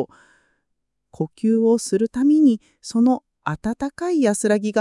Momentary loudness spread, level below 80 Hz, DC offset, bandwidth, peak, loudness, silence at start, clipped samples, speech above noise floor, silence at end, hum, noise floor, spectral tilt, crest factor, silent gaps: 12 LU; -56 dBFS; under 0.1%; 12 kHz; -6 dBFS; -20 LUFS; 0 s; under 0.1%; 58 dB; 0 s; none; -77 dBFS; -5.5 dB/octave; 14 dB; none